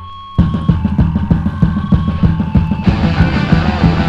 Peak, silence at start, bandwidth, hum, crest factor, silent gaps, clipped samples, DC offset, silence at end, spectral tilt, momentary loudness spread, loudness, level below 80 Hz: 0 dBFS; 0 s; 7 kHz; none; 12 dB; none; 0.2%; under 0.1%; 0 s; -8.5 dB/octave; 3 LU; -14 LUFS; -20 dBFS